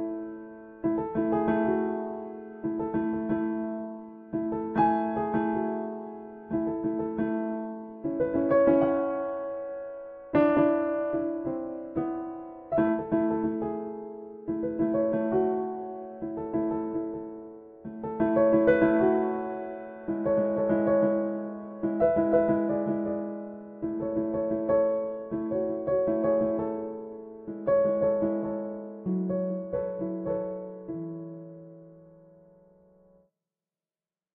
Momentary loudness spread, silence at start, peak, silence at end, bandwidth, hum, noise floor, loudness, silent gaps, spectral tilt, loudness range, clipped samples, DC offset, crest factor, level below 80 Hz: 15 LU; 0 s; -10 dBFS; 2.25 s; 3.7 kHz; none; under -90 dBFS; -28 LUFS; none; -8 dB/octave; 5 LU; under 0.1%; under 0.1%; 18 dB; -58 dBFS